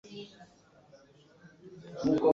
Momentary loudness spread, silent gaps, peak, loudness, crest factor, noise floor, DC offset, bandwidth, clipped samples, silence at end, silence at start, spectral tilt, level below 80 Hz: 28 LU; none; -14 dBFS; -33 LUFS; 20 dB; -60 dBFS; under 0.1%; 7.4 kHz; under 0.1%; 0 s; 0.1 s; -7 dB/octave; -66 dBFS